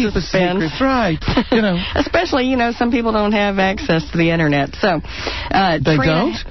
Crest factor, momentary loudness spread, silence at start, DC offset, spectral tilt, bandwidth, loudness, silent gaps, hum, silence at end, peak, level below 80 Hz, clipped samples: 12 dB; 4 LU; 0 s; 1%; -6.5 dB/octave; 6.2 kHz; -17 LUFS; none; none; 0 s; -4 dBFS; -32 dBFS; under 0.1%